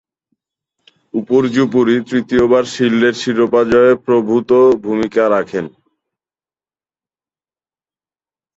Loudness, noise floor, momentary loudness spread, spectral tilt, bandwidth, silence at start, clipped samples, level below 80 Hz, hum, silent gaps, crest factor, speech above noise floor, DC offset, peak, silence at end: -14 LUFS; under -90 dBFS; 7 LU; -6 dB/octave; 8 kHz; 1.15 s; under 0.1%; -50 dBFS; none; none; 14 dB; over 77 dB; under 0.1%; -2 dBFS; 2.9 s